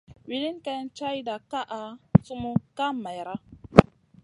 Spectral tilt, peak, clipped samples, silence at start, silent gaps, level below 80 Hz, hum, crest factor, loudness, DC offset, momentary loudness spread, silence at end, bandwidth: -7.5 dB/octave; 0 dBFS; under 0.1%; 0.1 s; none; -46 dBFS; none; 26 dB; -26 LUFS; under 0.1%; 17 LU; 0.4 s; 11 kHz